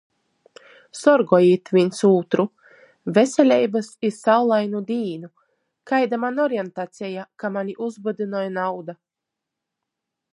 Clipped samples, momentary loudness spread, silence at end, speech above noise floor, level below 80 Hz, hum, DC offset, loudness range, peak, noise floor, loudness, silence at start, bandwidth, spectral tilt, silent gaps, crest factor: under 0.1%; 15 LU; 1.4 s; 64 dB; -74 dBFS; none; under 0.1%; 10 LU; -2 dBFS; -84 dBFS; -21 LUFS; 0.95 s; 11.5 kHz; -6 dB/octave; none; 20 dB